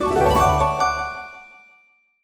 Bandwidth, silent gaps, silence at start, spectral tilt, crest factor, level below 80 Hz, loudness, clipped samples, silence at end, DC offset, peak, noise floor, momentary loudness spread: over 20 kHz; none; 0 s; -5 dB/octave; 16 dB; -34 dBFS; -19 LUFS; under 0.1%; 0.8 s; under 0.1%; -6 dBFS; -58 dBFS; 17 LU